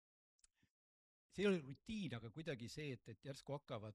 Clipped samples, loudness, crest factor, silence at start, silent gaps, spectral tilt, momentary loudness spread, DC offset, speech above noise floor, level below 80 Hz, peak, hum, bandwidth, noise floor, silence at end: under 0.1%; -47 LUFS; 20 dB; 1.35 s; none; -6 dB/octave; 14 LU; under 0.1%; over 44 dB; -74 dBFS; -28 dBFS; none; 13 kHz; under -90 dBFS; 0 s